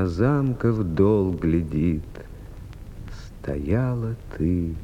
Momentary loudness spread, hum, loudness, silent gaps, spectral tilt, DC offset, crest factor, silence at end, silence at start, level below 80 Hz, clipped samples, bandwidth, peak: 21 LU; none; -24 LUFS; none; -9.5 dB/octave; under 0.1%; 16 dB; 0 s; 0 s; -38 dBFS; under 0.1%; 11 kHz; -6 dBFS